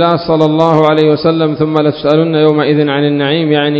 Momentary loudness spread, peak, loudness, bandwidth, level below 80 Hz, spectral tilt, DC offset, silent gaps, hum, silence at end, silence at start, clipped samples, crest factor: 3 LU; 0 dBFS; -11 LUFS; 7.2 kHz; -48 dBFS; -8.5 dB/octave; under 0.1%; none; none; 0 s; 0 s; 0.3%; 10 dB